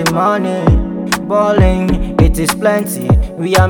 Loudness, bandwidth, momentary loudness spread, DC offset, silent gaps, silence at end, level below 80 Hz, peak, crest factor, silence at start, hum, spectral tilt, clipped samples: -13 LUFS; 19.5 kHz; 4 LU; under 0.1%; none; 0 s; -20 dBFS; 0 dBFS; 12 dB; 0 s; none; -6 dB/octave; 0.1%